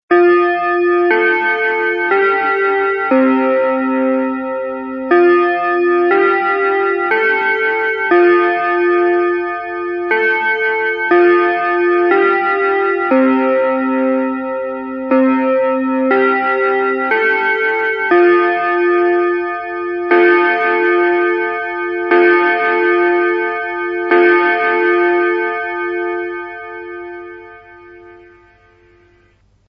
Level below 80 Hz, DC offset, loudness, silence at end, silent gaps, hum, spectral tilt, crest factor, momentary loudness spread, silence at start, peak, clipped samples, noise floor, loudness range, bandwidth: -58 dBFS; under 0.1%; -14 LUFS; 1.55 s; none; 50 Hz at -55 dBFS; -7 dB/octave; 14 dB; 10 LU; 0.1 s; 0 dBFS; under 0.1%; -53 dBFS; 2 LU; 5.4 kHz